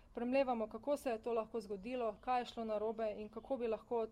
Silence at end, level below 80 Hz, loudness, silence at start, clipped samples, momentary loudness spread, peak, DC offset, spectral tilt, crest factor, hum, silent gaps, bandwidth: 0 s; -66 dBFS; -40 LUFS; 0.1 s; under 0.1%; 8 LU; -24 dBFS; under 0.1%; -5.5 dB/octave; 16 dB; none; none; 15.5 kHz